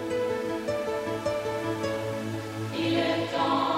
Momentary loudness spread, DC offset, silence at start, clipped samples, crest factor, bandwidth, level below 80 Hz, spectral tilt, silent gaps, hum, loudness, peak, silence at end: 7 LU; under 0.1%; 0 s; under 0.1%; 14 dB; 16 kHz; -60 dBFS; -5.5 dB/octave; none; none; -29 LUFS; -14 dBFS; 0 s